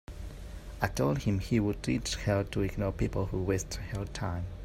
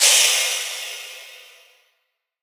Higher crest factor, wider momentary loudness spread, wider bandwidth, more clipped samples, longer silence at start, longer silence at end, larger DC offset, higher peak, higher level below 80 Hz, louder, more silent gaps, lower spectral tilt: about the same, 18 dB vs 22 dB; second, 14 LU vs 24 LU; second, 16 kHz vs over 20 kHz; neither; about the same, 0.1 s vs 0 s; second, 0 s vs 1 s; neither; second, -14 dBFS vs -2 dBFS; first, -42 dBFS vs under -90 dBFS; second, -32 LUFS vs -17 LUFS; neither; first, -6 dB/octave vs 7.5 dB/octave